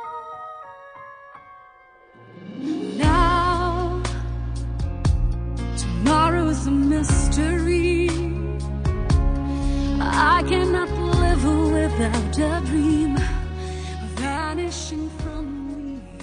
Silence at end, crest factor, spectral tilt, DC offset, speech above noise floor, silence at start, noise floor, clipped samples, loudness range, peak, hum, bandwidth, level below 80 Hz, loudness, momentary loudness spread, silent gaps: 0 s; 16 dB; -6 dB/octave; under 0.1%; 30 dB; 0 s; -50 dBFS; under 0.1%; 5 LU; -4 dBFS; none; 10 kHz; -28 dBFS; -22 LUFS; 15 LU; none